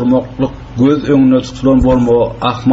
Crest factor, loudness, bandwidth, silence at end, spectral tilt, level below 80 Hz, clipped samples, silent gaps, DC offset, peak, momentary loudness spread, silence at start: 10 dB; -12 LUFS; 7.8 kHz; 0 s; -7 dB/octave; -28 dBFS; under 0.1%; none; under 0.1%; -2 dBFS; 8 LU; 0 s